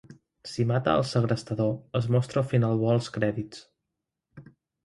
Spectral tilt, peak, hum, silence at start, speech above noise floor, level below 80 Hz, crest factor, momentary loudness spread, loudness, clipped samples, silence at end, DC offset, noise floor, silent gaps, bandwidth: -7 dB/octave; -10 dBFS; none; 0.1 s; 59 dB; -58 dBFS; 18 dB; 13 LU; -27 LUFS; under 0.1%; 0.45 s; under 0.1%; -85 dBFS; none; 11.5 kHz